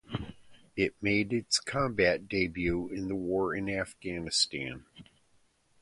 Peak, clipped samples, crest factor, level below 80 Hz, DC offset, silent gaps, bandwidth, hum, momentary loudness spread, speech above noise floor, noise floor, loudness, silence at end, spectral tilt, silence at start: -10 dBFS; under 0.1%; 22 dB; -54 dBFS; under 0.1%; none; 11.5 kHz; none; 13 LU; 37 dB; -68 dBFS; -31 LUFS; 0.8 s; -4 dB/octave; 0.1 s